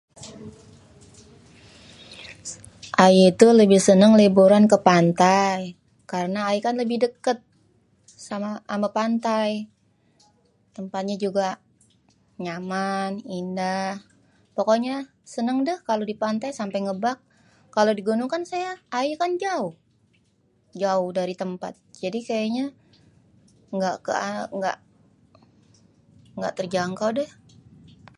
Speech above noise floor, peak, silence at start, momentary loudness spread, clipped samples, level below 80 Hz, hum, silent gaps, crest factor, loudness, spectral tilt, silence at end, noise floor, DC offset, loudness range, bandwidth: 43 dB; 0 dBFS; 0.2 s; 21 LU; under 0.1%; -66 dBFS; none; none; 22 dB; -22 LUFS; -5.5 dB/octave; 0.9 s; -64 dBFS; under 0.1%; 14 LU; 11.5 kHz